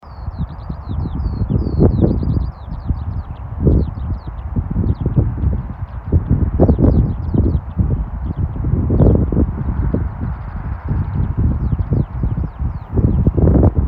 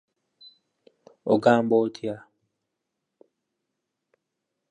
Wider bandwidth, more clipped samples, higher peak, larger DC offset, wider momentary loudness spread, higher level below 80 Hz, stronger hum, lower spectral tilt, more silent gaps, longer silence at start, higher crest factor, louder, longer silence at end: second, 4.9 kHz vs 9.8 kHz; neither; first, 0 dBFS vs -4 dBFS; neither; second, 13 LU vs 16 LU; first, -20 dBFS vs -76 dBFS; neither; first, -13 dB/octave vs -7 dB/octave; neither; second, 0.05 s vs 1.25 s; second, 16 dB vs 24 dB; first, -18 LUFS vs -23 LUFS; second, 0 s vs 2.5 s